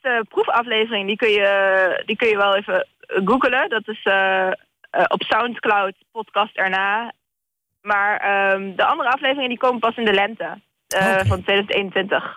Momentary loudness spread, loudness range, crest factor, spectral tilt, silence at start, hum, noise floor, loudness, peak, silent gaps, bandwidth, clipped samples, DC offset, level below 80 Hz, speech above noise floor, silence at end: 8 LU; 3 LU; 12 dB; -4.5 dB/octave; 0.05 s; none; -81 dBFS; -19 LUFS; -8 dBFS; none; 16 kHz; under 0.1%; under 0.1%; -54 dBFS; 61 dB; 0 s